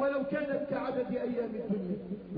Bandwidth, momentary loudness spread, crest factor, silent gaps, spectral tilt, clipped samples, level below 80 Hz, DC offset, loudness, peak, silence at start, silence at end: 5.2 kHz; 3 LU; 12 dB; none; -6.5 dB/octave; under 0.1%; -64 dBFS; under 0.1%; -34 LUFS; -20 dBFS; 0 s; 0 s